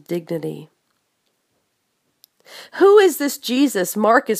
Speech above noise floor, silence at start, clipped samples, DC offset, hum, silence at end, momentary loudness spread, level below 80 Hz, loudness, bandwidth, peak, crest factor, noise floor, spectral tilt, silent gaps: 53 dB; 0.1 s; under 0.1%; under 0.1%; none; 0 s; 19 LU; -76 dBFS; -17 LUFS; 15.5 kHz; 0 dBFS; 18 dB; -70 dBFS; -4 dB/octave; none